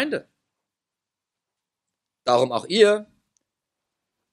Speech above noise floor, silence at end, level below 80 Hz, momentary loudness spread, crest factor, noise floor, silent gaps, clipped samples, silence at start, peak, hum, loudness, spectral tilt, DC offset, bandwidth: 67 dB; 1.3 s; -76 dBFS; 12 LU; 22 dB; -87 dBFS; none; under 0.1%; 0 s; -2 dBFS; none; -21 LUFS; -4 dB/octave; under 0.1%; 11.5 kHz